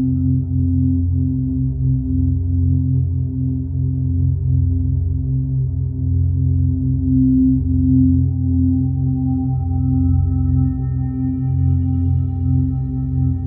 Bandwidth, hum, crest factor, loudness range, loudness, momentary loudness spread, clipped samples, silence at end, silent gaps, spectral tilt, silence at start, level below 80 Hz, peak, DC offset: 1.4 kHz; none; 12 dB; 3 LU; -18 LUFS; 5 LU; under 0.1%; 0 s; none; -16 dB/octave; 0 s; -26 dBFS; -4 dBFS; under 0.1%